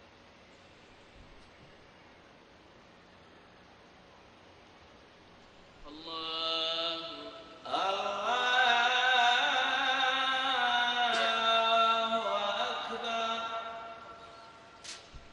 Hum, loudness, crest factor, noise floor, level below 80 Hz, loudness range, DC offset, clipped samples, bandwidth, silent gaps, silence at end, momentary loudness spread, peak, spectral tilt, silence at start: none; -29 LUFS; 20 dB; -57 dBFS; -66 dBFS; 10 LU; under 0.1%; under 0.1%; 10.5 kHz; none; 0.05 s; 21 LU; -14 dBFS; -1 dB/octave; 1.15 s